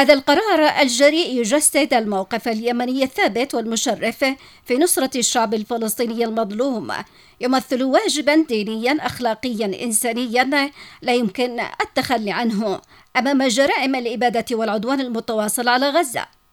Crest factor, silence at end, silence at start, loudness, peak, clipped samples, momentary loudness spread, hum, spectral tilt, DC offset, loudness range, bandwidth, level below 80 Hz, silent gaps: 20 dB; 0.25 s; 0 s; -19 LUFS; 0 dBFS; under 0.1%; 8 LU; none; -2.5 dB/octave; under 0.1%; 3 LU; 19 kHz; -58 dBFS; none